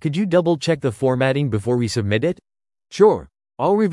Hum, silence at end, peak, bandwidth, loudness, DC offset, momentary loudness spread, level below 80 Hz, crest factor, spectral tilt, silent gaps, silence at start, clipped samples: none; 0 s; -2 dBFS; 12 kHz; -19 LUFS; under 0.1%; 8 LU; -54 dBFS; 16 dB; -6.5 dB/octave; none; 0 s; under 0.1%